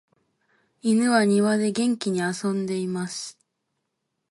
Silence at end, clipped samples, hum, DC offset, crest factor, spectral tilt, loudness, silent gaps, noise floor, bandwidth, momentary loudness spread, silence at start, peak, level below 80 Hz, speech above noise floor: 1 s; under 0.1%; none; under 0.1%; 16 dB; -5 dB/octave; -24 LUFS; none; -79 dBFS; 11.5 kHz; 11 LU; 0.85 s; -8 dBFS; -72 dBFS; 56 dB